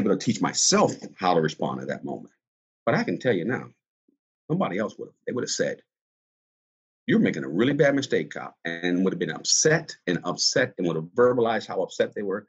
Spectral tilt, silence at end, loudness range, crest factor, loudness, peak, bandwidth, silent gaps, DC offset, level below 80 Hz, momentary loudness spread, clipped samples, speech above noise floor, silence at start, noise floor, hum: -3.5 dB/octave; 0.05 s; 6 LU; 18 dB; -25 LUFS; -6 dBFS; 9.4 kHz; 2.48-2.86 s, 3.88-4.08 s, 4.19-4.48 s, 6.01-7.07 s; under 0.1%; -66 dBFS; 12 LU; under 0.1%; over 65 dB; 0 s; under -90 dBFS; none